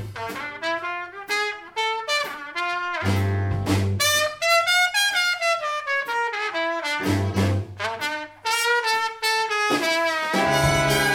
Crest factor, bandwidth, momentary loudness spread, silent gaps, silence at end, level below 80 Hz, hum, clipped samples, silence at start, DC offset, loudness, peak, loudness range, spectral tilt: 18 dB; 18 kHz; 8 LU; none; 0 s; -48 dBFS; none; under 0.1%; 0 s; under 0.1%; -22 LUFS; -6 dBFS; 4 LU; -3.5 dB/octave